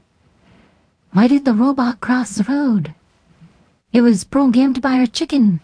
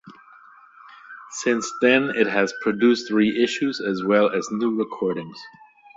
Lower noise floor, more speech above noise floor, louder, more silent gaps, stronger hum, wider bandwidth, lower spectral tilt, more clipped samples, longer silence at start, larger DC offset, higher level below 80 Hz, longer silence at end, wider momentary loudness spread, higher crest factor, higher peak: first, -56 dBFS vs -49 dBFS; first, 41 dB vs 28 dB; first, -16 LUFS vs -21 LUFS; neither; neither; first, 10.5 kHz vs 8 kHz; first, -6 dB/octave vs -4.5 dB/octave; neither; first, 1.15 s vs 0.05 s; neither; first, -54 dBFS vs -66 dBFS; second, 0.05 s vs 0.45 s; second, 6 LU vs 15 LU; about the same, 16 dB vs 18 dB; first, 0 dBFS vs -4 dBFS